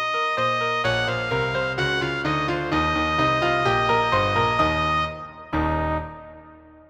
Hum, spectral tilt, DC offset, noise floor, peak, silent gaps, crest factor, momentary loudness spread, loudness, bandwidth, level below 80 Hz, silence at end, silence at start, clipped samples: none; -5.5 dB/octave; under 0.1%; -47 dBFS; -8 dBFS; none; 16 dB; 7 LU; -22 LUFS; 16 kHz; -40 dBFS; 0.2 s; 0 s; under 0.1%